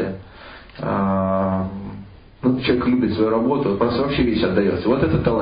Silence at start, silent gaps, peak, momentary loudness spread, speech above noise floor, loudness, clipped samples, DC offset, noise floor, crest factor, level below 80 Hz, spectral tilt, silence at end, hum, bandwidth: 0 s; none; -6 dBFS; 17 LU; 22 dB; -20 LUFS; under 0.1%; under 0.1%; -41 dBFS; 14 dB; -38 dBFS; -12 dB/octave; 0 s; none; 5.2 kHz